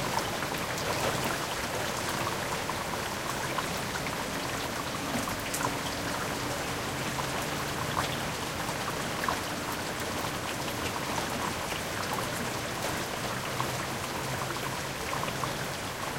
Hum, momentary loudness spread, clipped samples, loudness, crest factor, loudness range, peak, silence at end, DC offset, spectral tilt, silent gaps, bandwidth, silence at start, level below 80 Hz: none; 2 LU; under 0.1%; -32 LUFS; 20 dB; 1 LU; -12 dBFS; 0 s; under 0.1%; -3 dB/octave; none; 17 kHz; 0 s; -52 dBFS